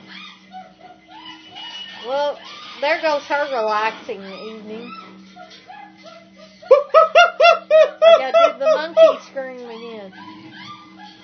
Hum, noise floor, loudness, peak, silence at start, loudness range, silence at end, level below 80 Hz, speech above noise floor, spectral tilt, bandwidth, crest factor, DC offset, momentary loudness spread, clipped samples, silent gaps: none; -44 dBFS; -15 LUFS; 0 dBFS; 0.1 s; 12 LU; 0.2 s; -72 dBFS; 28 dB; -3 dB/octave; 6.6 kHz; 18 dB; under 0.1%; 25 LU; under 0.1%; none